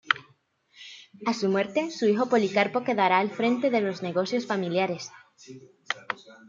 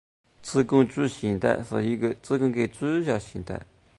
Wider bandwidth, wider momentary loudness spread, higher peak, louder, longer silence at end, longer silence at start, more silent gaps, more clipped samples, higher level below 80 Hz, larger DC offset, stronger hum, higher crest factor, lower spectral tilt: second, 7.6 kHz vs 11.5 kHz; about the same, 14 LU vs 14 LU; about the same, -4 dBFS vs -6 dBFS; about the same, -26 LUFS vs -26 LUFS; second, 0.15 s vs 0.35 s; second, 0.05 s vs 0.4 s; neither; neither; second, -76 dBFS vs -54 dBFS; neither; neither; about the same, 24 dB vs 20 dB; second, -5 dB/octave vs -6.5 dB/octave